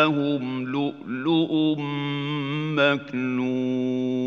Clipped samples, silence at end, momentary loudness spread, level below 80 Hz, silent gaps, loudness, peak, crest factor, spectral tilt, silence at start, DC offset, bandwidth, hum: under 0.1%; 0 s; 6 LU; -74 dBFS; none; -25 LUFS; -6 dBFS; 18 dB; -7.5 dB/octave; 0 s; under 0.1%; 6.8 kHz; none